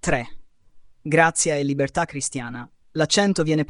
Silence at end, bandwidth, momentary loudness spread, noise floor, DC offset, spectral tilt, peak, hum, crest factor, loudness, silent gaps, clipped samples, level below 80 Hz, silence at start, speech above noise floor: 0.05 s; 11 kHz; 17 LU; -48 dBFS; under 0.1%; -4 dB/octave; -2 dBFS; none; 20 dB; -21 LUFS; none; under 0.1%; -46 dBFS; 0.05 s; 26 dB